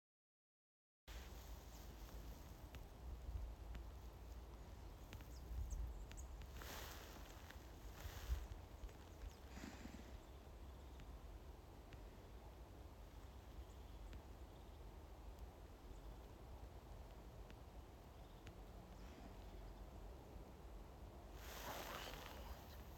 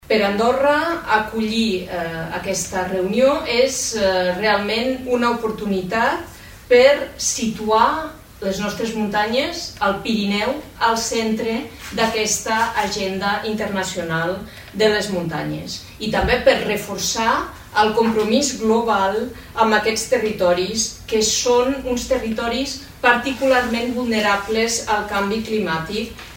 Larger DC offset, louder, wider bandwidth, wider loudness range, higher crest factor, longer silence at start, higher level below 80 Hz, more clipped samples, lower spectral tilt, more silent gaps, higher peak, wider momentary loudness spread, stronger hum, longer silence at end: neither; second, -57 LUFS vs -19 LUFS; about the same, 17 kHz vs 16.5 kHz; about the same, 5 LU vs 3 LU; about the same, 22 dB vs 20 dB; first, 1.05 s vs 0.1 s; second, -56 dBFS vs -42 dBFS; neither; first, -5 dB/octave vs -3.5 dB/octave; neither; second, -34 dBFS vs 0 dBFS; about the same, 9 LU vs 8 LU; neither; about the same, 0 s vs 0 s